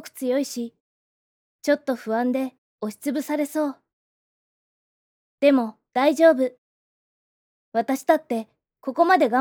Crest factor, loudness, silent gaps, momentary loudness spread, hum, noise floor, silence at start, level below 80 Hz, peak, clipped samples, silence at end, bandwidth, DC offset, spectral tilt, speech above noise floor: 18 dB; -23 LUFS; 0.80-1.59 s, 2.58-2.79 s, 3.93-5.38 s, 6.58-7.72 s; 14 LU; none; under -90 dBFS; 0.05 s; -84 dBFS; -6 dBFS; under 0.1%; 0 s; 19.5 kHz; under 0.1%; -4 dB/octave; over 69 dB